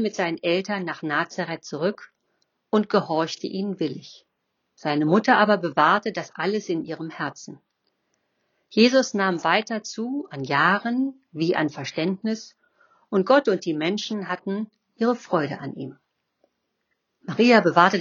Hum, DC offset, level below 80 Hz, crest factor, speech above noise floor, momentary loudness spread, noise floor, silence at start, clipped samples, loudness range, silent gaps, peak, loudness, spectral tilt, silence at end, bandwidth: none; under 0.1%; -78 dBFS; 22 dB; 53 dB; 14 LU; -76 dBFS; 0 s; under 0.1%; 5 LU; none; -2 dBFS; -23 LUFS; -5 dB/octave; 0 s; 7.4 kHz